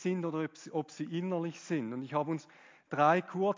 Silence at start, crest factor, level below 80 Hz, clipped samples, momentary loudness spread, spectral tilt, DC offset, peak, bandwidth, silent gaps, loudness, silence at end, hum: 0 s; 20 dB; -90 dBFS; under 0.1%; 11 LU; -6.5 dB/octave; under 0.1%; -14 dBFS; 7.6 kHz; none; -34 LUFS; 0 s; none